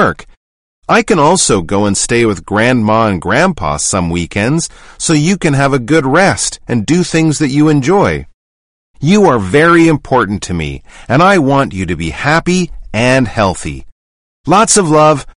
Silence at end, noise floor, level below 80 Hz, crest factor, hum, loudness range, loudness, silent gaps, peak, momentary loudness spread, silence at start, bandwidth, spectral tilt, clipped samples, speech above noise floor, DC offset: 0.1 s; under -90 dBFS; -34 dBFS; 12 dB; none; 2 LU; -11 LUFS; 0.37-0.82 s, 8.34-8.94 s, 13.92-14.44 s; 0 dBFS; 10 LU; 0 s; 11 kHz; -4.5 dB/octave; under 0.1%; over 79 dB; 0.7%